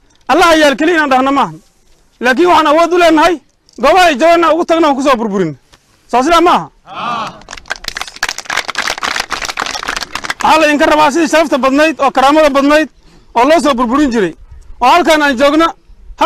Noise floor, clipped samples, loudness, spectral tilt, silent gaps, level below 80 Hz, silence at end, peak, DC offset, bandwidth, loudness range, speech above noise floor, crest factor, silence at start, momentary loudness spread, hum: -48 dBFS; under 0.1%; -10 LUFS; -3.5 dB/octave; none; -38 dBFS; 0 s; -2 dBFS; under 0.1%; 16 kHz; 6 LU; 39 dB; 10 dB; 0.3 s; 12 LU; none